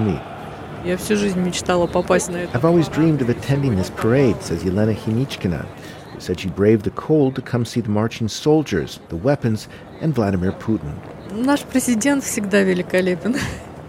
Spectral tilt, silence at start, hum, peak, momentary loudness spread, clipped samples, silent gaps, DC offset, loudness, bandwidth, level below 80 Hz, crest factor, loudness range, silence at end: -6 dB/octave; 0 s; none; -2 dBFS; 11 LU; under 0.1%; none; under 0.1%; -20 LUFS; 16.5 kHz; -44 dBFS; 18 dB; 3 LU; 0 s